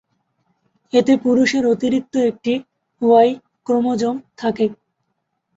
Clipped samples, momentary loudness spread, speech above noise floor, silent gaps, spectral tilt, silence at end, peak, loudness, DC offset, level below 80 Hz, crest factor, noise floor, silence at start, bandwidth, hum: under 0.1%; 9 LU; 56 dB; none; -5.5 dB/octave; 0.85 s; -2 dBFS; -18 LUFS; under 0.1%; -62 dBFS; 16 dB; -73 dBFS; 0.95 s; 8 kHz; none